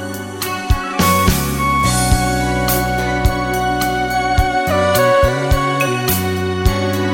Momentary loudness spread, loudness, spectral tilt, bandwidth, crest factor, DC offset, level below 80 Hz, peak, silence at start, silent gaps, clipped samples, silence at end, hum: 6 LU; -16 LUFS; -4.5 dB/octave; 17 kHz; 14 dB; under 0.1%; -24 dBFS; -2 dBFS; 0 s; none; under 0.1%; 0 s; none